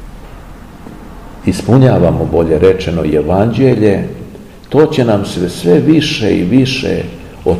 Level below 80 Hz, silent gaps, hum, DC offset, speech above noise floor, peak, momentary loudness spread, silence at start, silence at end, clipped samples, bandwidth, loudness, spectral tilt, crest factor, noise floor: -32 dBFS; none; none; 0.6%; 21 dB; 0 dBFS; 17 LU; 0 s; 0 s; 1%; 13.5 kHz; -11 LUFS; -7 dB/octave; 12 dB; -31 dBFS